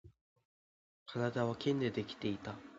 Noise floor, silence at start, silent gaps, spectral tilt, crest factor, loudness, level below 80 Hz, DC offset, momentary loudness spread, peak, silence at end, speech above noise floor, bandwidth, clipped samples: under -90 dBFS; 0.05 s; 0.21-0.36 s, 0.45-1.06 s; -5.5 dB/octave; 20 dB; -38 LUFS; -70 dBFS; under 0.1%; 10 LU; -20 dBFS; 0 s; over 53 dB; 7.6 kHz; under 0.1%